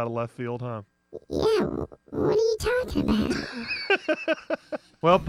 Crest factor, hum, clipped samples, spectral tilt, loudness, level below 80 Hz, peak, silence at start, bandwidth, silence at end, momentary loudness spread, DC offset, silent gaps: 20 dB; none; under 0.1%; -5.5 dB/octave; -27 LUFS; -46 dBFS; -6 dBFS; 0 s; 15.5 kHz; 0 s; 12 LU; under 0.1%; none